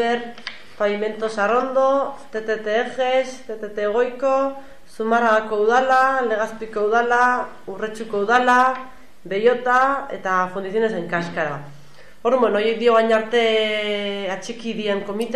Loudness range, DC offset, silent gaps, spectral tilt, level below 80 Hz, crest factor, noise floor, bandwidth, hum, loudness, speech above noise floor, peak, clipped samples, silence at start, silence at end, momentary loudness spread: 3 LU; 1%; none; -4.5 dB/octave; -58 dBFS; 14 dB; -47 dBFS; 12 kHz; none; -20 LUFS; 27 dB; -6 dBFS; under 0.1%; 0 s; 0 s; 12 LU